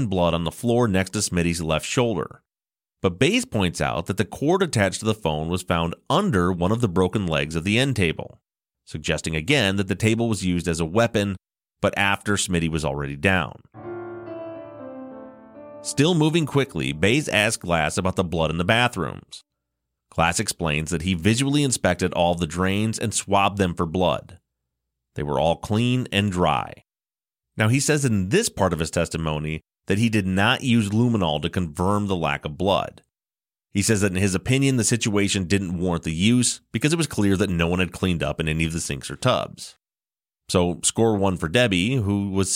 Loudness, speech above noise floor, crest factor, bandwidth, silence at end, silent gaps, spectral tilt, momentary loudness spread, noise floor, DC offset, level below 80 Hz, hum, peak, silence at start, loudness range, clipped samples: -22 LUFS; over 68 dB; 18 dB; 16.5 kHz; 0 s; none; -4.5 dB/octave; 11 LU; under -90 dBFS; under 0.1%; -44 dBFS; none; -4 dBFS; 0 s; 3 LU; under 0.1%